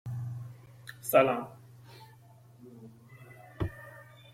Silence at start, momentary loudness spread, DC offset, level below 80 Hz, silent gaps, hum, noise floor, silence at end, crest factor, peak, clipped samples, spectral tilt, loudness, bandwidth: 0.05 s; 28 LU; under 0.1%; -58 dBFS; none; none; -56 dBFS; 0.3 s; 24 dB; -10 dBFS; under 0.1%; -6 dB/octave; -30 LUFS; 16 kHz